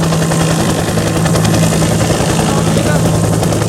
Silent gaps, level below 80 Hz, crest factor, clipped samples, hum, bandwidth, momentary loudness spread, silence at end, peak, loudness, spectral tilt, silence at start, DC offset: none; -28 dBFS; 12 dB; under 0.1%; none; 16 kHz; 2 LU; 0 s; 0 dBFS; -12 LUFS; -5 dB/octave; 0 s; under 0.1%